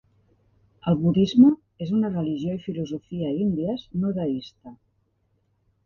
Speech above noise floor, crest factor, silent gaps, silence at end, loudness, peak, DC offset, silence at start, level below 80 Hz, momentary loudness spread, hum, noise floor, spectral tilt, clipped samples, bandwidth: 46 dB; 20 dB; none; 1.1 s; -24 LUFS; -4 dBFS; under 0.1%; 0.85 s; -56 dBFS; 14 LU; none; -69 dBFS; -9 dB/octave; under 0.1%; 7 kHz